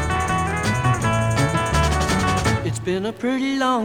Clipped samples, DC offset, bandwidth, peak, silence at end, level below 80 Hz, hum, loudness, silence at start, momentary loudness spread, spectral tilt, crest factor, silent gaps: under 0.1%; under 0.1%; 17.5 kHz; -6 dBFS; 0 s; -32 dBFS; none; -21 LUFS; 0 s; 4 LU; -5 dB/octave; 14 dB; none